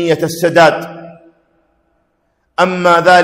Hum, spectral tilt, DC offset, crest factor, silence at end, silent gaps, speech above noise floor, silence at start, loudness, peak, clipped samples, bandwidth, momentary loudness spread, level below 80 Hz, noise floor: none; -4.5 dB/octave; under 0.1%; 14 dB; 0 s; none; 52 dB; 0 s; -11 LUFS; 0 dBFS; under 0.1%; 16.5 kHz; 18 LU; -54 dBFS; -63 dBFS